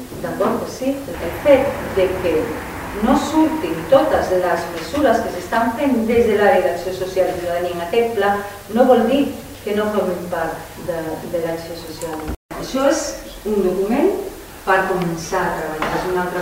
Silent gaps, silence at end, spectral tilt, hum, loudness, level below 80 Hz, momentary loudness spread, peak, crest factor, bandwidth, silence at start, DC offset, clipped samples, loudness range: 12.36-12.49 s; 0 s; -5 dB/octave; none; -19 LUFS; -40 dBFS; 12 LU; 0 dBFS; 18 dB; 16 kHz; 0 s; under 0.1%; under 0.1%; 6 LU